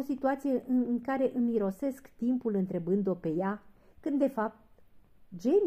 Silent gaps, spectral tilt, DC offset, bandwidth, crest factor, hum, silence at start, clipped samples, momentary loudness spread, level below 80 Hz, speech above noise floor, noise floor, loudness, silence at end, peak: none; -8.5 dB/octave; under 0.1%; 14.5 kHz; 14 dB; none; 0 s; under 0.1%; 7 LU; -66 dBFS; 27 dB; -57 dBFS; -31 LUFS; 0 s; -16 dBFS